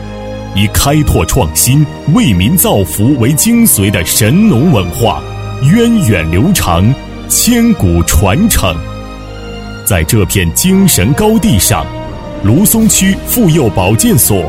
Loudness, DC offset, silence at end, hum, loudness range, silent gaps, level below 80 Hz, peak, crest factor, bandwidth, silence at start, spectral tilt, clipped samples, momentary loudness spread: -9 LUFS; under 0.1%; 0 s; none; 2 LU; none; -24 dBFS; 0 dBFS; 10 dB; 17.5 kHz; 0 s; -4.5 dB/octave; 0.1%; 12 LU